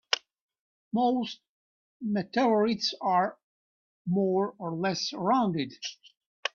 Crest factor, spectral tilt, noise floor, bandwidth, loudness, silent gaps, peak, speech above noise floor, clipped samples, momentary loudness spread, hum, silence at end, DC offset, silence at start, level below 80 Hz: 24 dB; -5 dB/octave; under -90 dBFS; 7.2 kHz; -29 LUFS; 0.42-0.49 s, 0.61-0.91 s, 1.49-2.00 s, 3.43-4.05 s, 6.17-6.43 s; -6 dBFS; over 62 dB; under 0.1%; 12 LU; none; 0.05 s; under 0.1%; 0.1 s; -74 dBFS